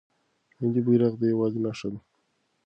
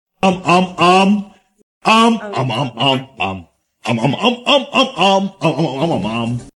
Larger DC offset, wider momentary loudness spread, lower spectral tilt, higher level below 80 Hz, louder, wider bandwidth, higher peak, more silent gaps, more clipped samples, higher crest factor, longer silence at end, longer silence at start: neither; first, 14 LU vs 10 LU; first, -8.5 dB/octave vs -5 dB/octave; second, -66 dBFS vs -52 dBFS; second, -26 LUFS vs -15 LUFS; second, 8 kHz vs 12 kHz; second, -10 dBFS vs 0 dBFS; second, none vs 1.63-1.81 s; neither; about the same, 18 dB vs 14 dB; first, 0.65 s vs 0.05 s; first, 0.6 s vs 0.25 s